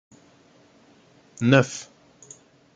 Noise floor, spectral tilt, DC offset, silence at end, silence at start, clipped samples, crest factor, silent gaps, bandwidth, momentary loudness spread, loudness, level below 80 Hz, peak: -56 dBFS; -5.5 dB/octave; under 0.1%; 0.95 s; 1.4 s; under 0.1%; 24 dB; none; 9.2 kHz; 28 LU; -21 LUFS; -66 dBFS; -2 dBFS